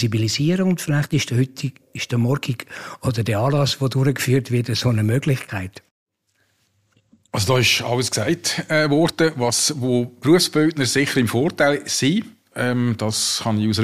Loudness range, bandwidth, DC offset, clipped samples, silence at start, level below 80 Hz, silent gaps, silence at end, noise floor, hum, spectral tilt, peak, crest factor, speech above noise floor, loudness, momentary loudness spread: 4 LU; 15.5 kHz; under 0.1%; under 0.1%; 0 s; -54 dBFS; 5.91-6.06 s; 0 s; -67 dBFS; none; -4.5 dB/octave; -4 dBFS; 16 dB; 47 dB; -20 LUFS; 8 LU